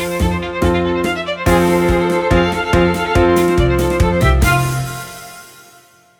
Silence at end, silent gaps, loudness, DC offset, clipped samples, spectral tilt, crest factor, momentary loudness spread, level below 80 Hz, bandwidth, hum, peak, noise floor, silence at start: 0.75 s; none; -15 LUFS; under 0.1%; under 0.1%; -6 dB/octave; 14 dB; 9 LU; -24 dBFS; 19.5 kHz; none; 0 dBFS; -47 dBFS; 0 s